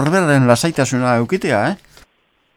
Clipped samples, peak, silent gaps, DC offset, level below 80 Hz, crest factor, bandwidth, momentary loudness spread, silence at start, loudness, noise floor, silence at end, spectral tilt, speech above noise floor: under 0.1%; 0 dBFS; none; under 0.1%; -52 dBFS; 16 dB; 16 kHz; 6 LU; 0 s; -15 LUFS; -61 dBFS; 0.8 s; -5.5 dB/octave; 46 dB